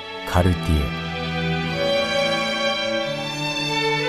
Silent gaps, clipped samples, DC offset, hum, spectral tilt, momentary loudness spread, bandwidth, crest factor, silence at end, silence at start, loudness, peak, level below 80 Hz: none; under 0.1%; 0.2%; none; -5 dB/octave; 5 LU; 15 kHz; 16 dB; 0 s; 0 s; -22 LUFS; -6 dBFS; -34 dBFS